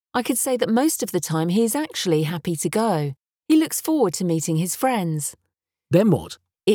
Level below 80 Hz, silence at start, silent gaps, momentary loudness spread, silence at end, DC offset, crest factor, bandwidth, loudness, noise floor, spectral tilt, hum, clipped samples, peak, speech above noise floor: -62 dBFS; 0.15 s; none; 7 LU; 0 s; under 0.1%; 16 dB; over 20 kHz; -22 LUFS; -78 dBFS; -5 dB/octave; none; under 0.1%; -6 dBFS; 57 dB